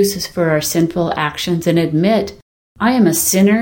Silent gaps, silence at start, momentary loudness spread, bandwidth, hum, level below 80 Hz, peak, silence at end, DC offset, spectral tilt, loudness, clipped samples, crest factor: 2.42-2.75 s; 0 s; 6 LU; 17 kHz; none; -46 dBFS; -2 dBFS; 0 s; under 0.1%; -4.5 dB/octave; -15 LUFS; under 0.1%; 14 dB